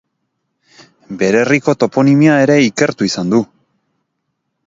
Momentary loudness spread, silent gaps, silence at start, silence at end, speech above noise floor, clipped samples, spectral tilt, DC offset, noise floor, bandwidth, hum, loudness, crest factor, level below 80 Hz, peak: 8 LU; none; 1.1 s; 1.25 s; 59 dB; under 0.1%; -6 dB/octave; under 0.1%; -71 dBFS; 7.8 kHz; none; -12 LUFS; 14 dB; -58 dBFS; 0 dBFS